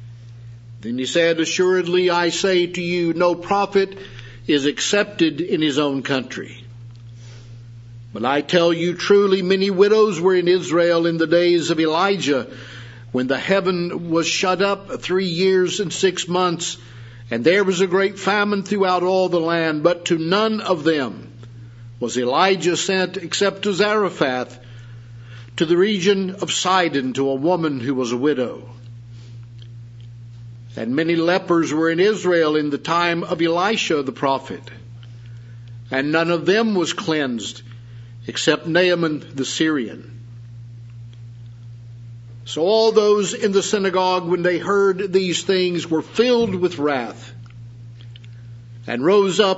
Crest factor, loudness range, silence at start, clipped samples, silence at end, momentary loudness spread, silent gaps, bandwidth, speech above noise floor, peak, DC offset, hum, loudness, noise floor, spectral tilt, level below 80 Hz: 20 dB; 5 LU; 0 s; under 0.1%; 0 s; 22 LU; none; 8 kHz; 20 dB; 0 dBFS; under 0.1%; none; -19 LUFS; -38 dBFS; -4.5 dB/octave; -58 dBFS